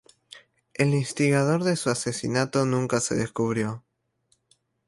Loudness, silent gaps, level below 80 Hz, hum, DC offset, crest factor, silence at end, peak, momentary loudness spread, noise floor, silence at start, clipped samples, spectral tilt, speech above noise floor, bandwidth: -25 LUFS; none; -62 dBFS; none; under 0.1%; 18 dB; 1.1 s; -8 dBFS; 6 LU; -70 dBFS; 0.35 s; under 0.1%; -5.5 dB/octave; 46 dB; 11.5 kHz